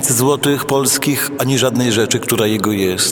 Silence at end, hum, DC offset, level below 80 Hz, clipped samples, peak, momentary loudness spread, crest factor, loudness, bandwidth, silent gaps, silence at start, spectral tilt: 0 s; none; under 0.1%; -54 dBFS; under 0.1%; 0 dBFS; 3 LU; 14 dB; -15 LUFS; over 20 kHz; none; 0 s; -3.5 dB/octave